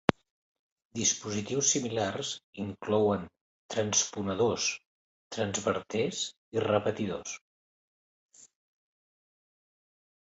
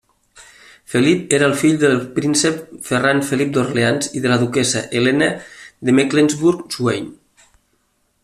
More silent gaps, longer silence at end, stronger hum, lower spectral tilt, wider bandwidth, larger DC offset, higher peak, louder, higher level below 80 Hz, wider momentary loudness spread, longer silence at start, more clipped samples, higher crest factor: first, 0.31-0.76 s, 0.85-0.90 s, 2.44-2.53 s, 3.41-3.69 s, 4.86-5.31 s, 6.37-6.52 s, 7.41-8.29 s vs none; first, 1.9 s vs 1.1 s; neither; second, -3 dB/octave vs -4.5 dB/octave; second, 8.2 kHz vs 14.5 kHz; neither; about the same, 0 dBFS vs 0 dBFS; second, -30 LUFS vs -17 LUFS; second, -62 dBFS vs -56 dBFS; first, 12 LU vs 8 LU; second, 0.1 s vs 0.35 s; neither; first, 32 dB vs 18 dB